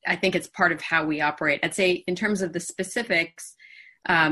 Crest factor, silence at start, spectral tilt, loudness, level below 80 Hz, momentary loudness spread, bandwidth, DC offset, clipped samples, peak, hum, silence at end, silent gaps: 18 dB; 0.05 s; -4 dB/octave; -24 LUFS; -62 dBFS; 9 LU; 12.5 kHz; under 0.1%; under 0.1%; -6 dBFS; none; 0 s; none